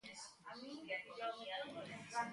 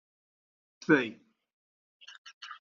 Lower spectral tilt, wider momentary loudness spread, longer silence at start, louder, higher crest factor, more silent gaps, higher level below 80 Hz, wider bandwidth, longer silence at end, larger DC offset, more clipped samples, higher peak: about the same, -3 dB/octave vs -4 dB/octave; second, 9 LU vs 24 LU; second, 0.05 s vs 0.9 s; second, -47 LUFS vs -28 LUFS; second, 20 dB vs 26 dB; second, none vs 1.53-2.00 s, 2.18-2.25 s, 2.33-2.41 s; second, -86 dBFS vs -80 dBFS; first, 11.5 kHz vs 7.2 kHz; about the same, 0 s vs 0.05 s; neither; neither; second, -28 dBFS vs -10 dBFS